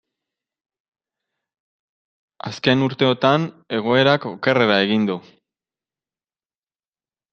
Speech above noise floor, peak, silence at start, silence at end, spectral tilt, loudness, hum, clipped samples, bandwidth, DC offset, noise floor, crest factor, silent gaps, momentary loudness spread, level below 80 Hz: over 72 dB; -2 dBFS; 2.45 s; 2.15 s; -6.5 dB/octave; -18 LUFS; none; under 0.1%; 7.2 kHz; under 0.1%; under -90 dBFS; 20 dB; none; 9 LU; -66 dBFS